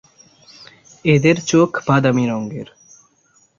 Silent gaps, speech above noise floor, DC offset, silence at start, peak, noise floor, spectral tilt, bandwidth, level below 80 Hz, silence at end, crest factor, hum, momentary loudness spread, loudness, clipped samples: none; 42 dB; under 0.1%; 1.05 s; -2 dBFS; -58 dBFS; -6 dB/octave; 7.6 kHz; -56 dBFS; 0.95 s; 18 dB; none; 15 LU; -16 LUFS; under 0.1%